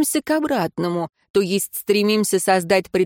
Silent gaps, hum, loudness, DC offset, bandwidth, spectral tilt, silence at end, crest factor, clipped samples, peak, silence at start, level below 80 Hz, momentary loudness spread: 1.30-1.34 s; none; -20 LUFS; under 0.1%; 17 kHz; -4 dB/octave; 0 s; 16 dB; under 0.1%; -4 dBFS; 0 s; -60 dBFS; 6 LU